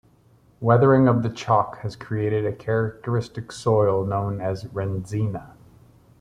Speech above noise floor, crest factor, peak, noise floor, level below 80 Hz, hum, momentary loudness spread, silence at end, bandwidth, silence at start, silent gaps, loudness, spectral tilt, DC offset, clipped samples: 35 dB; 20 dB; -4 dBFS; -57 dBFS; -54 dBFS; none; 12 LU; 0.7 s; 10.5 kHz; 0.6 s; none; -23 LUFS; -8 dB/octave; under 0.1%; under 0.1%